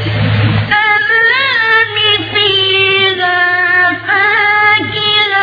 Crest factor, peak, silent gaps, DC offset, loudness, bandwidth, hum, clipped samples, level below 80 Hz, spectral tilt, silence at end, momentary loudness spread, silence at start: 10 dB; 0 dBFS; none; under 0.1%; -9 LUFS; 5.2 kHz; none; under 0.1%; -42 dBFS; -6 dB/octave; 0 s; 3 LU; 0 s